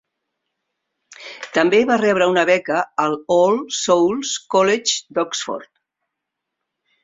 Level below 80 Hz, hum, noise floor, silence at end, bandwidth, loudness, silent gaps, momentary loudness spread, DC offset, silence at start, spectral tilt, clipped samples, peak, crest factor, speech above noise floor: -64 dBFS; none; -80 dBFS; 1.4 s; 8 kHz; -18 LUFS; none; 11 LU; under 0.1%; 1.1 s; -3 dB/octave; under 0.1%; 0 dBFS; 20 dB; 63 dB